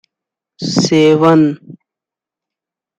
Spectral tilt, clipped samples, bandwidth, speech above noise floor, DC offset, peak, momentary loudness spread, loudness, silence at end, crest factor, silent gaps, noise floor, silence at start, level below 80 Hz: -5.5 dB/octave; under 0.1%; 9 kHz; 76 dB; under 0.1%; -2 dBFS; 14 LU; -11 LUFS; 1.25 s; 14 dB; none; -86 dBFS; 0.6 s; -56 dBFS